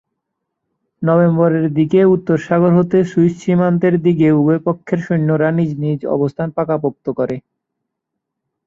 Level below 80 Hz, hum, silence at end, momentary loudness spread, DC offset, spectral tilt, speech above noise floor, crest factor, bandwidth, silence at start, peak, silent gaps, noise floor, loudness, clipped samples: -56 dBFS; none; 1.3 s; 8 LU; under 0.1%; -9.5 dB/octave; 64 dB; 14 dB; 7.4 kHz; 1 s; -2 dBFS; none; -78 dBFS; -15 LUFS; under 0.1%